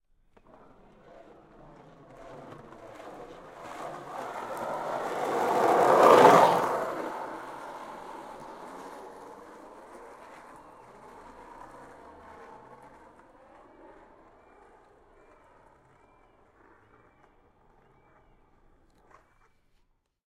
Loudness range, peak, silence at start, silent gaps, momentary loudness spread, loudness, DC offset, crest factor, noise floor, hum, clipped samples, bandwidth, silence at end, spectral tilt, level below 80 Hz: 26 LU; -4 dBFS; 2.2 s; none; 30 LU; -24 LUFS; under 0.1%; 28 dB; -70 dBFS; none; under 0.1%; 16.5 kHz; 7.85 s; -4.5 dB/octave; -66 dBFS